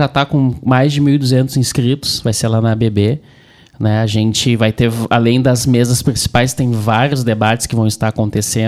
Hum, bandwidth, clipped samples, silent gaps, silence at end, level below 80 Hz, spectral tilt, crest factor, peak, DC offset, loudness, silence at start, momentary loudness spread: none; 15 kHz; under 0.1%; none; 0 s; -38 dBFS; -5.5 dB/octave; 12 dB; 0 dBFS; under 0.1%; -14 LUFS; 0 s; 4 LU